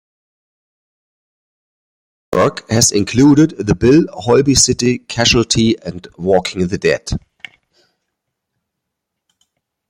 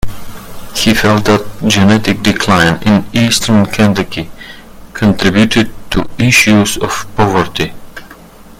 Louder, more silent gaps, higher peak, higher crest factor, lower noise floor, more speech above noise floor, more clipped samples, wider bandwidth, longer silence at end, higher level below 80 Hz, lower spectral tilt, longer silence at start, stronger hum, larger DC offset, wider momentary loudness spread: about the same, -13 LUFS vs -11 LUFS; neither; about the same, 0 dBFS vs 0 dBFS; about the same, 16 dB vs 12 dB; first, -77 dBFS vs -35 dBFS; first, 64 dB vs 25 dB; second, under 0.1% vs 0.2%; about the same, 16 kHz vs 16.5 kHz; first, 2.7 s vs 0.05 s; second, -38 dBFS vs -32 dBFS; about the same, -4 dB/octave vs -4.5 dB/octave; first, 2.3 s vs 0.05 s; neither; neither; second, 10 LU vs 16 LU